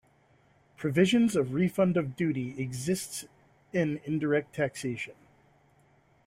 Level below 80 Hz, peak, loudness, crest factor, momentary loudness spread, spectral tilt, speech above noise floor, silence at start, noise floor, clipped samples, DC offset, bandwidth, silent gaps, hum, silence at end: -66 dBFS; -12 dBFS; -29 LUFS; 18 dB; 11 LU; -6 dB/octave; 36 dB; 0.8 s; -64 dBFS; under 0.1%; under 0.1%; 16 kHz; none; none; 1.15 s